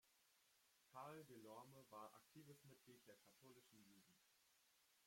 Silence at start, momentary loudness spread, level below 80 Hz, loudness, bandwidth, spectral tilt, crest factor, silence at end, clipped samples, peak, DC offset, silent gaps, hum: 0.05 s; 9 LU; under -90 dBFS; -64 LUFS; 16.5 kHz; -4.5 dB/octave; 20 dB; 0 s; under 0.1%; -46 dBFS; under 0.1%; none; none